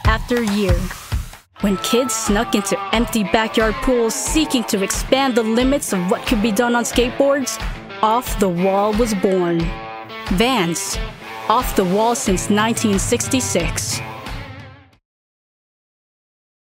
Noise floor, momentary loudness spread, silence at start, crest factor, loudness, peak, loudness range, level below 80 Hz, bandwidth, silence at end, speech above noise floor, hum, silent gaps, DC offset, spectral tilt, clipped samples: -40 dBFS; 10 LU; 0 s; 18 dB; -18 LUFS; -2 dBFS; 3 LU; -30 dBFS; 16.5 kHz; 2.05 s; 22 dB; none; none; under 0.1%; -4 dB/octave; under 0.1%